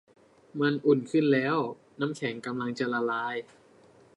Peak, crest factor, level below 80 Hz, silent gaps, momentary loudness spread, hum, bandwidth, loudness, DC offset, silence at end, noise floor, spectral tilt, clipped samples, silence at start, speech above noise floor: -10 dBFS; 18 dB; -78 dBFS; none; 10 LU; none; 11 kHz; -28 LUFS; under 0.1%; 0.75 s; -58 dBFS; -6.5 dB/octave; under 0.1%; 0.55 s; 30 dB